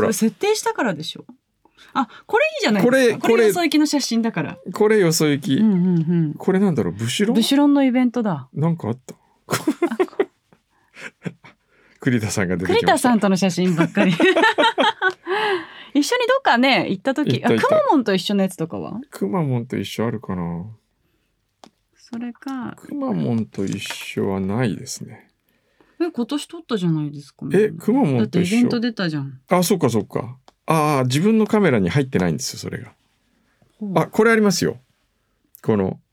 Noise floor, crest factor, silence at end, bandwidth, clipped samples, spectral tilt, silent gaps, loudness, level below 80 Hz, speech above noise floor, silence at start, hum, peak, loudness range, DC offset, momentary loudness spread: -68 dBFS; 18 dB; 0.15 s; 19 kHz; under 0.1%; -5.5 dB/octave; none; -19 LUFS; -66 dBFS; 49 dB; 0 s; none; 0 dBFS; 9 LU; under 0.1%; 14 LU